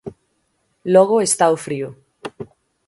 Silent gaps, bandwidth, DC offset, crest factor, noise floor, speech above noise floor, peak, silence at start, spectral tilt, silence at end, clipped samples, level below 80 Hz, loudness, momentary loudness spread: none; 11.5 kHz; under 0.1%; 20 dB; -67 dBFS; 51 dB; 0 dBFS; 0.05 s; -4 dB/octave; 0.45 s; under 0.1%; -62 dBFS; -16 LUFS; 24 LU